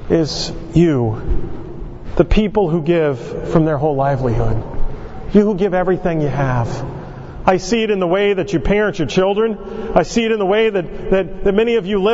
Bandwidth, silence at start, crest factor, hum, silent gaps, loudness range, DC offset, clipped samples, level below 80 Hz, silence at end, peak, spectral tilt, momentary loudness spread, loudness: 8 kHz; 0 s; 16 dB; none; none; 1 LU; under 0.1%; under 0.1%; -26 dBFS; 0 s; 0 dBFS; -6.5 dB/octave; 11 LU; -17 LUFS